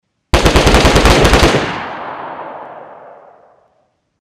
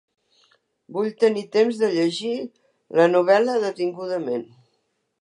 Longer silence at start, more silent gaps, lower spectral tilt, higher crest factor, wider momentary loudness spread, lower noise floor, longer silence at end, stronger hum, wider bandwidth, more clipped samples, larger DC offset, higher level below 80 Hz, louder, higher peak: second, 0.35 s vs 0.9 s; neither; about the same, -4.5 dB/octave vs -5.5 dB/octave; about the same, 12 dB vs 16 dB; first, 21 LU vs 12 LU; second, -60 dBFS vs -72 dBFS; first, 1.25 s vs 0.75 s; neither; first, 16 kHz vs 10.5 kHz; neither; neither; first, -20 dBFS vs -80 dBFS; first, -10 LUFS vs -22 LUFS; first, -2 dBFS vs -6 dBFS